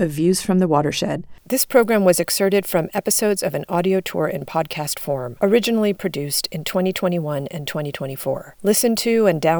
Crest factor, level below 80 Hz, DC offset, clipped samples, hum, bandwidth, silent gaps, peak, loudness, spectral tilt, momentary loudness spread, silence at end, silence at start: 16 dB; -54 dBFS; under 0.1%; under 0.1%; none; over 20 kHz; none; -4 dBFS; -20 LUFS; -4.5 dB/octave; 9 LU; 0 s; 0 s